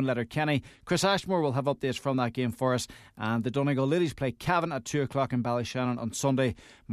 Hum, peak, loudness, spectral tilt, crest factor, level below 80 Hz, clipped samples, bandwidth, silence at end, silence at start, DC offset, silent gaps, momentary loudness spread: none; -10 dBFS; -29 LUFS; -5.5 dB/octave; 18 dB; -58 dBFS; under 0.1%; 14 kHz; 0 s; 0 s; under 0.1%; none; 5 LU